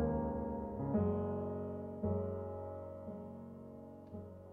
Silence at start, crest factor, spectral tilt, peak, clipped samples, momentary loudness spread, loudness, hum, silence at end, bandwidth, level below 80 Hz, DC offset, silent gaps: 0 s; 16 dB; -12 dB/octave; -24 dBFS; under 0.1%; 15 LU; -41 LUFS; none; 0 s; 3.4 kHz; -54 dBFS; under 0.1%; none